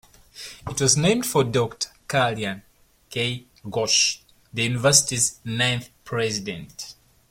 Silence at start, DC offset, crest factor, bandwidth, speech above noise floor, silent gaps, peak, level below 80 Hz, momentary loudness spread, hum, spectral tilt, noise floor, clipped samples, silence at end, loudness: 0.35 s; under 0.1%; 24 dB; 16.5 kHz; 20 dB; none; -2 dBFS; -54 dBFS; 19 LU; none; -3 dB/octave; -43 dBFS; under 0.1%; 0.4 s; -22 LUFS